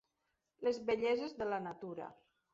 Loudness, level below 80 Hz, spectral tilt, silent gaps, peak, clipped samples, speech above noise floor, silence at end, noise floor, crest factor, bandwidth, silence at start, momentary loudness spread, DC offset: -38 LUFS; -74 dBFS; -3.5 dB/octave; none; -24 dBFS; under 0.1%; 48 dB; 0.4 s; -85 dBFS; 16 dB; 7.6 kHz; 0.6 s; 13 LU; under 0.1%